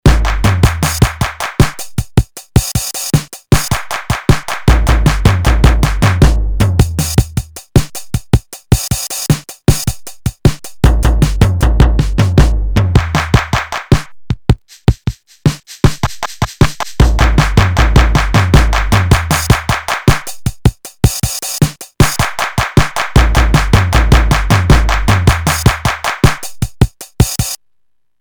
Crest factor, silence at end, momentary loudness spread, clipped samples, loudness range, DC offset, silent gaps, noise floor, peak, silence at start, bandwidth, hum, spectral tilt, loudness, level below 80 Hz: 12 dB; 0.65 s; 7 LU; 0.3%; 4 LU; under 0.1%; none; -67 dBFS; 0 dBFS; 0.05 s; over 20 kHz; none; -5 dB/octave; -13 LUFS; -16 dBFS